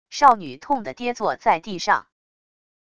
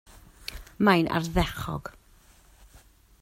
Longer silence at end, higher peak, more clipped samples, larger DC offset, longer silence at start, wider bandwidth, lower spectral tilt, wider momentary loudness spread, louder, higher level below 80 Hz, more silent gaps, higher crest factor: second, 0.8 s vs 1.3 s; first, -2 dBFS vs -6 dBFS; neither; first, 0.5% vs under 0.1%; second, 0.1 s vs 0.4 s; second, 11 kHz vs 16 kHz; second, -3.5 dB/octave vs -6 dB/octave; second, 9 LU vs 19 LU; first, -21 LUFS vs -26 LUFS; second, -60 dBFS vs -42 dBFS; neither; about the same, 20 dB vs 24 dB